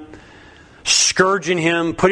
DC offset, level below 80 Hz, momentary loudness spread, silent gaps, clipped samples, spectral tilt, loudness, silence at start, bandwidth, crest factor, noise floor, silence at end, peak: under 0.1%; -48 dBFS; 5 LU; none; under 0.1%; -2.5 dB/octave; -16 LUFS; 0 s; 10.5 kHz; 18 dB; -44 dBFS; 0 s; 0 dBFS